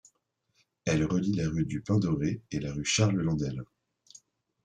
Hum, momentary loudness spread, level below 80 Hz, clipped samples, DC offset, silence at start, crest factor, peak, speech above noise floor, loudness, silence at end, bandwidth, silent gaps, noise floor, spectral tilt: none; 10 LU; -54 dBFS; under 0.1%; under 0.1%; 0.85 s; 18 dB; -12 dBFS; 47 dB; -29 LUFS; 1 s; 9.6 kHz; none; -76 dBFS; -5.5 dB/octave